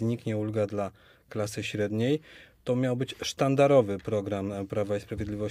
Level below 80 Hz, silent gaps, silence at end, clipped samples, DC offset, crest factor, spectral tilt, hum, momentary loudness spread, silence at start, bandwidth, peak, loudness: -56 dBFS; none; 0 s; under 0.1%; under 0.1%; 18 dB; -6.5 dB/octave; none; 12 LU; 0 s; 15.5 kHz; -10 dBFS; -29 LUFS